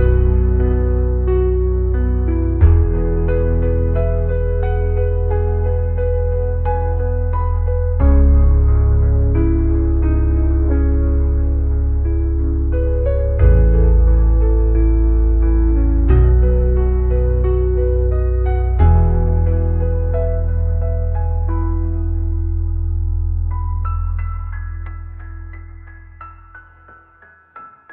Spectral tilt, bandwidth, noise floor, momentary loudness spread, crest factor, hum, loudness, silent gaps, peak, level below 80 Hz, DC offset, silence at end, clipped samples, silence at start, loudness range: -11 dB/octave; 2.7 kHz; -48 dBFS; 8 LU; 14 dB; none; -17 LUFS; none; -2 dBFS; -16 dBFS; 0.4%; 0 s; under 0.1%; 0 s; 8 LU